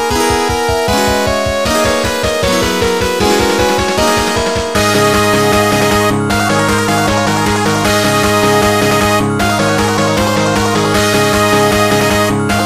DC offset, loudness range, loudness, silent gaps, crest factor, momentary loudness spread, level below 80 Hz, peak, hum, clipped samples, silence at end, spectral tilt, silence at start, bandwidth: 0.8%; 1 LU; -11 LUFS; none; 12 dB; 3 LU; -30 dBFS; 0 dBFS; none; under 0.1%; 0 s; -4 dB/octave; 0 s; 15.5 kHz